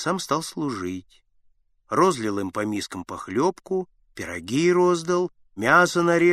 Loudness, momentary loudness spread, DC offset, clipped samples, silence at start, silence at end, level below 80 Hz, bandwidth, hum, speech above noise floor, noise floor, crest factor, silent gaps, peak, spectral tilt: -23 LUFS; 14 LU; under 0.1%; under 0.1%; 0 s; 0 s; -62 dBFS; 14 kHz; none; 39 dB; -61 dBFS; 20 dB; none; -2 dBFS; -5 dB/octave